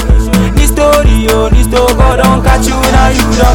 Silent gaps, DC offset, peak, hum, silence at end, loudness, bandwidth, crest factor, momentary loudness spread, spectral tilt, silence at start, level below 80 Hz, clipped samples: none; under 0.1%; 0 dBFS; none; 0 s; -8 LUFS; 17.5 kHz; 6 dB; 2 LU; -5 dB/octave; 0 s; -10 dBFS; 0.3%